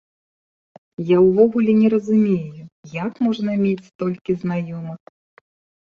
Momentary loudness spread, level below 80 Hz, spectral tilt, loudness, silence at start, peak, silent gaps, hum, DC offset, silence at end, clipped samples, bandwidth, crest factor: 17 LU; -60 dBFS; -9 dB/octave; -19 LUFS; 1 s; -2 dBFS; 2.72-2.83 s, 3.95-3.99 s; none; under 0.1%; 0.9 s; under 0.1%; 7 kHz; 18 dB